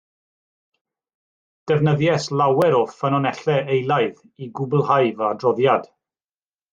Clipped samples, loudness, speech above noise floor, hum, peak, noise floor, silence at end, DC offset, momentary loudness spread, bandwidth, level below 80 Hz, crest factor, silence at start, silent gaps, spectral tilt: under 0.1%; -20 LUFS; over 71 dB; none; -4 dBFS; under -90 dBFS; 0.9 s; under 0.1%; 7 LU; 9 kHz; -64 dBFS; 18 dB; 1.65 s; none; -7 dB/octave